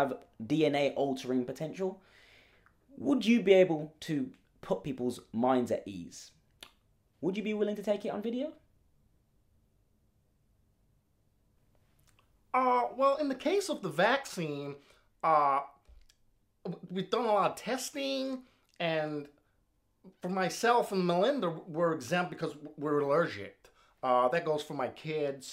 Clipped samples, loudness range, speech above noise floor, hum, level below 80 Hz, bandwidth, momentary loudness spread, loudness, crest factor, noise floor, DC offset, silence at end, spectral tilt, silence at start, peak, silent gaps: under 0.1%; 7 LU; 43 dB; none; -72 dBFS; 16 kHz; 14 LU; -31 LUFS; 22 dB; -74 dBFS; under 0.1%; 0 s; -5.5 dB/octave; 0 s; -12 dBFS; none